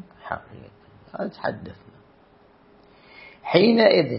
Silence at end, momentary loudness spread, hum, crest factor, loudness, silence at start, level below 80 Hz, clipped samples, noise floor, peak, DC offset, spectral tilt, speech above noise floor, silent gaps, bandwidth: 0 s; 23 LU; none; 22 dB; -21 LUFS; 0.25 s; -62 dBFS; under 0.1%; -55 dBFS; -2 dBFS; under 0.1%; -10.5 dB/octave; 34 dB; none; 5.8 kHz